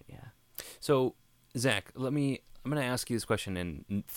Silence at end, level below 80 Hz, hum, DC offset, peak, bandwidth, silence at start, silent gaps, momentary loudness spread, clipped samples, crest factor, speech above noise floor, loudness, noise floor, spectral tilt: 0 s; -58 dBFS; none; under 0.1%; -12 dBFS; 17.5 kHz; 0.1 s; none; 16 LU; under 0.1%; 22 dB; 20 dB; -33 LUFS; -52 dBFS; -5 dB/octave